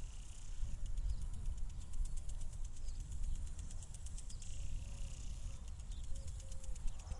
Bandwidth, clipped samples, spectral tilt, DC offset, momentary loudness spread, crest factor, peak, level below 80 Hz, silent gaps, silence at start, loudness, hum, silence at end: 11.5 kHz; under 0.1%; -4.5 dB/octave; under 0.1%; 4 LU; 14 dB; -26 dBFS; -44 dBFS; none; 0 s; -49 LUFS; none; 0 s